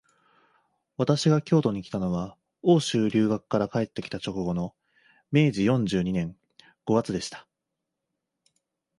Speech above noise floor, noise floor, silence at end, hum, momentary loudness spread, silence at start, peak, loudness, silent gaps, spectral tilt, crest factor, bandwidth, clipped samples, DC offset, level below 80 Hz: 60 dB; -84 dBFS; 1.6 s; none; 14 LU; 1 s; -8 dBFS; -26 LUFS; none; -6.5 dB/octave; 20 dB; 11.5 kHz; under 0.1%; under 0.1%; -56 dBFS